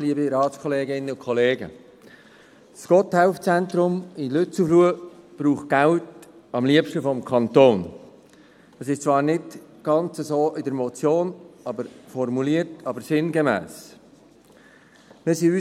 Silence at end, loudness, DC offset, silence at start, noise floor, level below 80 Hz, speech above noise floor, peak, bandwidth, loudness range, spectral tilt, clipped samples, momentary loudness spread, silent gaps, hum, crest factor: 0 s; -22 LUFS; under 0.1%; 0 s; -52 dBFS; -68 dBFS; 31 dB; -2 dBFS; 15 kHz; 5 LU; -6.5 dB/octave; under 0.1%; 15 LU; none; none; 20 dB